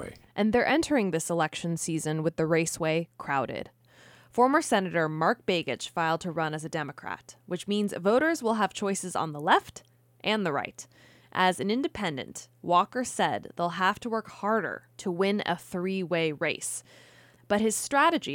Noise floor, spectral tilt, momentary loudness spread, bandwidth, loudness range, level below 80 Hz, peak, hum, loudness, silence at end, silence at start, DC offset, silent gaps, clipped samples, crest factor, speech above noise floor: -56 dBFS; -4.5 dB/octave; 12 LU; 17.5 kHz; 2 LU; -64 dBFS; -10 dBFS; none; -28 LUFS; 0 s; 0 s; under 0.1%; none; under 0.1%; 20 dB; 28 dB